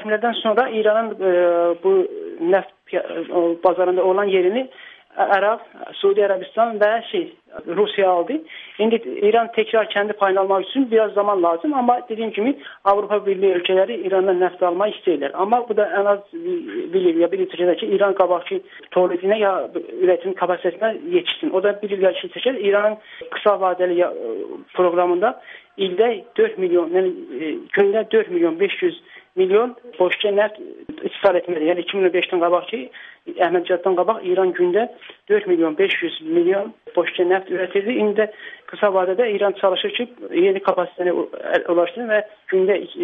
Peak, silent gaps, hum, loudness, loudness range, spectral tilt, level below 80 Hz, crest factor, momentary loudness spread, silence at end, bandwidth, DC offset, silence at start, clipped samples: -2 dBFS; none; none; -19 LUFS; 1 LU; -8 dB/octave; -70 dBFS; 16 dB; 9 LU; 0 s; 3.9 kHz; under 0.1%; 0 s; under 0.1%